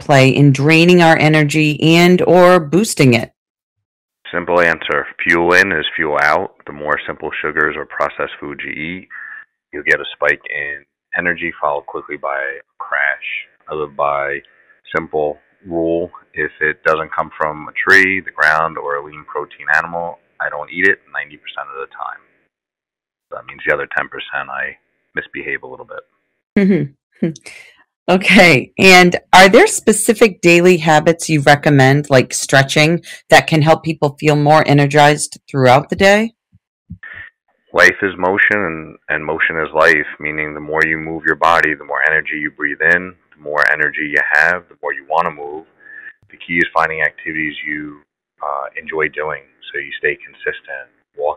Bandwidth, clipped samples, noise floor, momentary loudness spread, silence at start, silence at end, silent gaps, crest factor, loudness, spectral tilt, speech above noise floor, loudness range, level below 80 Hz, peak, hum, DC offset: 16.5 kHz; under 0.1%; -88 dBFS; 18 LU; 0 s; 0 s; 3.37-3.55 s, 3.63-3.76 s, 3.85-4.09 s, 26.43-26.56 s, 27.03-27.11 s, 27.96-28.06 s, 36.67-36.86 s; 14 dB; -13 LUFS; -5 dB/octave; 74 dB; 12 LU; -48 dBFS; 0 dBFS; none; under 0.1%